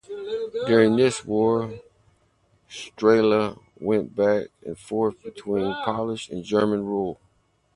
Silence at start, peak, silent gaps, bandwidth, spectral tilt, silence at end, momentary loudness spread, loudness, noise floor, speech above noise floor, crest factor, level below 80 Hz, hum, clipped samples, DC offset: 0.1 s; -4 dBFS; none; 11 kHz; -6 dB/octave; 0.6 s; 18 LU; -23 LUFS; -65 dBFS; 42 dB; 20 dB; -58 dBFS; none; under 0.1%; under 0.1%